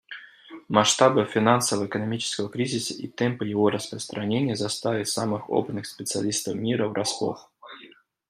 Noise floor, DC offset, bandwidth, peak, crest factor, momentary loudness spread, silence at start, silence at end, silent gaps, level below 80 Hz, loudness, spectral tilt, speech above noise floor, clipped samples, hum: -52 dBFS; under 0.1%; 15 kHz; -4 dBFS; 22 dB; 16 LU; 0.1 s; 0.4 s; none; -68 dBFS; -25 LUFS; -4 dB/octave; 27 dB; under 0.1%; none